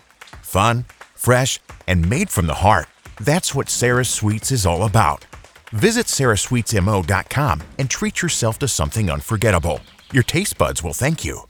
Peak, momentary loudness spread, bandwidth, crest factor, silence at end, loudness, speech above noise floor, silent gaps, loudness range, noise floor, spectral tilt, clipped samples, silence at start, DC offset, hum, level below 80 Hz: 0 dBFS; 7 LU; over 20 kHz; 18 dB; 0.05 s; -19 LUFS; 21 dB; none; 2 LU; -39 dBFS; -4.5 dB/octave; under 0.1%; 0.35 s; under 0.1%; none; -36 dBFS